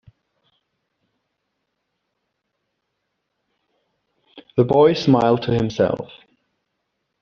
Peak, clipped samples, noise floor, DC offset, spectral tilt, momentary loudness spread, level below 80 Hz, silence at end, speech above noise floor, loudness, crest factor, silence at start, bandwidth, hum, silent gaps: -4 dBFS; under 0.1%; -76 dBFS; under 0.1%; -6 dB/octave; 11 LU; -54 dBFS; 1.15 s; 59 dB; -18 LUFS; 20 dB; 4.35 s; 7.2 kHz; none; none